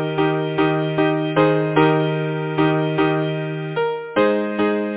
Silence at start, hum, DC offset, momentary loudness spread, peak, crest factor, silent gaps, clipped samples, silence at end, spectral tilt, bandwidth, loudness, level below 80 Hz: 0 s; none; under 0.1%; 6 LU; -2 dBFS; 18 dB; none; under 0.1%; 0 s; -11 dB/octave; 4 kHz; -19 LUFS; -54 dBFS